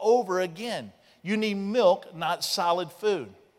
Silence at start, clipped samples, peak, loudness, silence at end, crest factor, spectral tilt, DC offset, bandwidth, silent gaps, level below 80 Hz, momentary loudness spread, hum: 0 s; under 0.1%; -10 dBFS; -27 LUFS; 0.25 s; 18 dB; -4 dB/octave; under 0.1%; 16 kHz; none; -76 dBFS; 11 LU; none